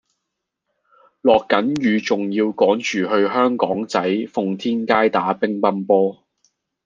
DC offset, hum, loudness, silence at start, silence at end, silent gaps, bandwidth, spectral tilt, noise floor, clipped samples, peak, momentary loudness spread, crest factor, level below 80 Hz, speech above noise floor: under 0.1%; none; -19 LUFS; 1.25 s; 0.7 s; none; 7.6 kHz; -5.5 dB/octave; -79 dBFS; under 0.1%; 0 dBFS; 5 LU; 20 dB; -64 dBFS; 61 dB